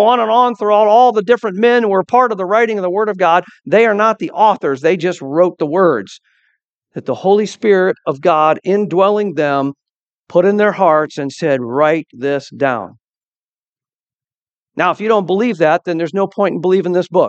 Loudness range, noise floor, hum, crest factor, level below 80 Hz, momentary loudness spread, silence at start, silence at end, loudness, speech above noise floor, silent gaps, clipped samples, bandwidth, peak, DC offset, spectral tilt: 6 LU; under -90 dBFS; none; 14 dB; -68 dBFS; 7 LU; 0 s; 0 s; -14 LUFS; over 77 dB; 6.63-6.81 s, 9.90-10.25 s, 13.00-13.21 s, 13.27-13.76 s, 13.94-14.04 s, 14.15-14.20 s, 14.35-14.67 s; under 0.1%; 8.4 kHz; 0 dBFS; under 0.1%; -6.5 dB/octave